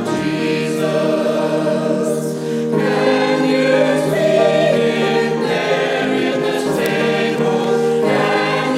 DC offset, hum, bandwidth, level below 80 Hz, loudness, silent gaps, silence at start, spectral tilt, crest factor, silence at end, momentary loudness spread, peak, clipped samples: under 0.1%; none; 16 kHz; -56 dBFS; -16 LUFS; none; 0 s; -5.5 dB/octave; 14 dB; 0 s; 4 LU; -2 dBFS; under 0.1%